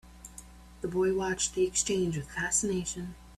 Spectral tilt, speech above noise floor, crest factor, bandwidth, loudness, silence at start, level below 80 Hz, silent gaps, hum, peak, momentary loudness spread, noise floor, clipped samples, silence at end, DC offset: -3.5 dB/octave; 20 dB; 18 dB; 13.5 kHz; -30 LUFS; 0.05 s; -52 dBFS; none; 60 Hz at -50 dBFS; -14 dBFS; 20 LU; -50 dBFS; under 0.1%; 0 s; under 0.1%